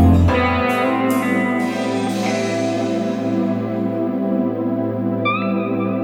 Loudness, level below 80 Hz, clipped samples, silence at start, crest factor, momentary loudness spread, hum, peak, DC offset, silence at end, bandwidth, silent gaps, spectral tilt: -19 LUFS; -40 dBFS; under 0.1%; 0 s; 16 dB; 5 LU; none; -2 dBFS; under 0.1%; 0 s; 18 kHz; none; -7 dB/octave